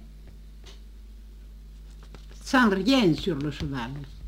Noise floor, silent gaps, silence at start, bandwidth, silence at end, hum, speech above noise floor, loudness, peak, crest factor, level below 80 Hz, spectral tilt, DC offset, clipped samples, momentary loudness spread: -45 dBFS; none; 0 s; 16 kHz; 0 s; 50 Hz at -45 dBFS; 21 dB; -24 LUFS; -8 dBFS; 20 dB; -44 dBFS; -5.5 dB/octave; under 0.1%; under 0.1%; 26 LU